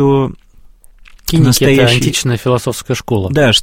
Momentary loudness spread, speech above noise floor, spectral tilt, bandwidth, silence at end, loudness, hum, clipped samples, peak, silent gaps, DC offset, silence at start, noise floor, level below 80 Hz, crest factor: 10 LU; 29 dB; -5 dB/octave; 17 kHz; 0 s; -12 LUFS; none; under 0.1%; 0 dBFS; none; under 0.1%; 0 s; -40 dBFS; -34 dBFS; 12 dB